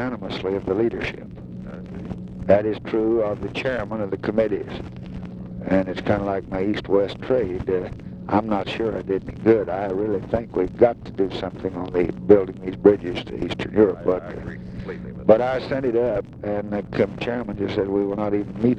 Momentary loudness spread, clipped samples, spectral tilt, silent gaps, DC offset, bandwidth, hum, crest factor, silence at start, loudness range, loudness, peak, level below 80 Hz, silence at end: 15 LU; under 0.1%; -8 dB/octave; none; under 0.1%; 8.2 kHz; none; 22 dB; 0 s; 3 LU; -23 LUFS; 0 dBFS; -44 dBFS; 0 s